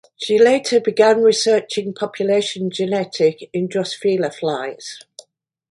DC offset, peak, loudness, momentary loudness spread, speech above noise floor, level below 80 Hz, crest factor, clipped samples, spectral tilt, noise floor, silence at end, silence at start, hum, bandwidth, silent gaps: under 0.1%; -2 dBFS; -18 LUFS; 12 LU; 30 dB; -68 dBFS; 16 dB; under 0.1%; -4 dB/octave; -48 dBFS; 0.75 s; 0.2 s; none; 11.5 kHz; none